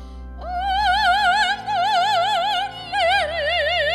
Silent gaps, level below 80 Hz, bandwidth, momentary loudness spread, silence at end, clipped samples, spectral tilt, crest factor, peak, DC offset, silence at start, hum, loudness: none; -40 dBFS; 15 kHz; 9 LU; 0 s; under 0.1%; -2.5 dB/octave; 14 dB; -6 dBFS; under 0.1%; 0 s; none; -19 LUFS